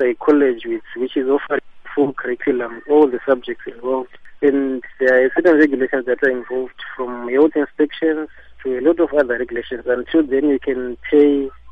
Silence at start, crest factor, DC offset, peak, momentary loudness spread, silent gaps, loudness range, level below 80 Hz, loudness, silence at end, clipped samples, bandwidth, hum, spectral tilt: 0 s; 16 dB; under 0.1%; -2 dBFS; 12 LU; none; 2 LU; -52 dBFS; -18 LUFS; 0 s; under 0.1%; 5.2 kHz; none; -7 dB/octave